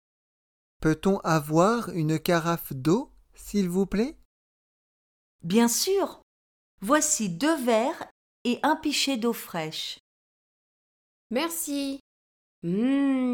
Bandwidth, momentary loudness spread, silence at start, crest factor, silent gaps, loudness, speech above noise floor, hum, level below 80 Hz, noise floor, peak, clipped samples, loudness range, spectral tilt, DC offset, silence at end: over 20 kHz; 12 LU; 0.8 s; 20 dB; 4.25-5.39 s, 6.23-6.78 s, 8.11-8.45 s, 10.00-11.30 s, 12.00-12.62 s; -26 LUFS; over 65 dB; none; -56 dBFS; under -90 dBFS; -8 dBFS; under 0.1%; 5 LU; -4.5 dB/octave; under 0.1%; 0 s